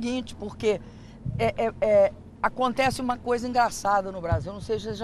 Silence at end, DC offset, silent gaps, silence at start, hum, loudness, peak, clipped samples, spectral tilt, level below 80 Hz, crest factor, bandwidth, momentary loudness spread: 0 s; under 0.1%; none; 0 s; none; -26 LUFS; -8 dBFS; under 0.1%; -5.5 dB/octave; -46 dBFS; 18 dB; 13 kHz; 10 LU